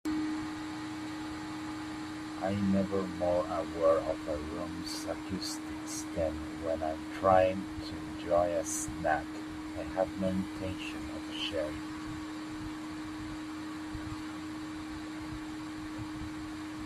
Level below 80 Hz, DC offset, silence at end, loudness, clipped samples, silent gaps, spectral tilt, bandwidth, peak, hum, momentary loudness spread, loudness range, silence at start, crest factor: -56 dBFS; under 0.1%; 0 s; -35 LUFS; under 0.1%; none; -5 dB/octave; 14.5 kHz; -12 dBFS; none; 11 LU; 9 LU; 0.05 s; 22 dB